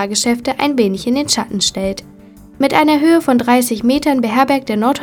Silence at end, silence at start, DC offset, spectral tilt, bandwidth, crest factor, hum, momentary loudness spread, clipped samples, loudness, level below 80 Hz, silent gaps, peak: 0 s; 0 s; under 0.1%; -3.5 dB/octave; 19.5 kHz; 14 dB; none; 6 LU; under 0.1%; -14 LUFS; -46 dBFS; none; 0 dBFS